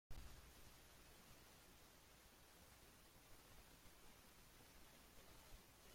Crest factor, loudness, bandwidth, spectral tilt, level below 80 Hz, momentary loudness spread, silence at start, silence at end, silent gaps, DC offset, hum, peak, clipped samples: 22 dB; -66 LUFS; 16.5 kHz; -3 dB/octave; -70 dBFS; 3 LU; 0.1 s; 0 s; none; under 0.1%; none; -42 dBFS; under 0.1%